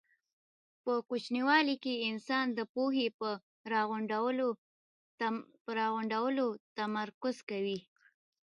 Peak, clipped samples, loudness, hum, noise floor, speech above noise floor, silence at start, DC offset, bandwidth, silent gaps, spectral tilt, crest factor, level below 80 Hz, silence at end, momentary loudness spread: -12 dBFS; under 0.1%; -34 LUFS; none; under -90 dBFS; over 56 dB; 0.85 s; under 0.1%; 10.5 kHz; 2.69-2.75 s, 3.14-3.19 s, 3.43-3.64 s, 4.58-5.18 s, 5.61-5.65 s, 6.60-6.76 s, 7.14-7.21 s, 7.43-7.47 s; -5 dB/octave; 22 dB; -88 dBFS; 0.7 s; 9 LU